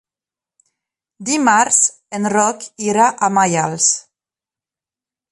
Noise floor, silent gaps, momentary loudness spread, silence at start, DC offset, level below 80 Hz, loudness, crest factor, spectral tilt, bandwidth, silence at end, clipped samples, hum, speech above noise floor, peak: -90 dBFS; none; 11 LU; 1.2 s; under 0.1%; -64 dBFS; -15 LUFS; 18 dB; -2.5 dB/octave; 11.5 kHz; 1.3 s; under 0.1%; none; 74 dB; 0 dBFS